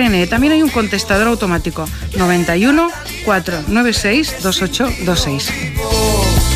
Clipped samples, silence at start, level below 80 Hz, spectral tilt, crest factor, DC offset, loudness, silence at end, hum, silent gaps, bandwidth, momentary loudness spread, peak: under 0.1%; 0 s; -24 dBFS; -4.5 dB/octave; 12 dB; under 0.1%; -15 LUFS; 0 s; none; none; 15.5 kHz; 7 LU; -2 dBFS